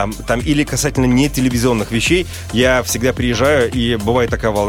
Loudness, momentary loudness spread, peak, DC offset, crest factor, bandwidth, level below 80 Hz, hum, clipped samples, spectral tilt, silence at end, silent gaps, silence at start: -15 LUFS; 3 LU; -2 dBFS; under 0.1%; 14 dB; 17 kHz; -30 dBFS; none; under 0.1%; -4.5 dB/octave; 0 s; none; 0 s